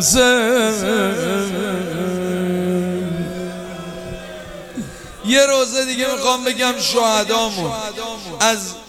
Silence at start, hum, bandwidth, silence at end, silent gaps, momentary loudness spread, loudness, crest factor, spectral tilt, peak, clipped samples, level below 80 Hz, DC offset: 0 s; none; 16.5 kHz; 0 s; none; 17 LU; -18 LUFS; 18 dB; -3 dB/octave; 0 dBFS; under 0.1%; -46 dBFS; under 0.1%